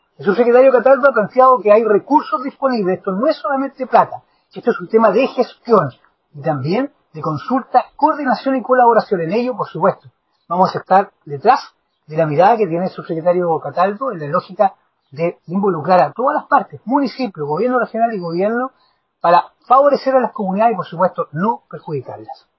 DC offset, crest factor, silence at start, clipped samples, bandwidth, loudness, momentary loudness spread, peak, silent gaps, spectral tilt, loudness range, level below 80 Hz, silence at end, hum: under 0.1%; 16 dB; 0.2 s; under 0.1%; 6 kHz; -16 LUFS; 11 LU; 0 dBFS; none; -8.5 dB/octave; 3 LU; -66 dBFS; 0.25 s; none